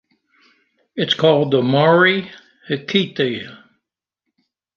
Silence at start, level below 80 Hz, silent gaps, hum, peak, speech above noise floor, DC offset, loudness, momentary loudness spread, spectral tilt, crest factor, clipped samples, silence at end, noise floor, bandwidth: 0.95 s; -66 dBFS; none; none; -2 dBFS; 64 dB; under 0.1%; -17 LUFS; 17 LU; -6.5 dB/octave; 18 dB; under 0.1%; 1.2 s; -80 dBFS; 7.2 kHz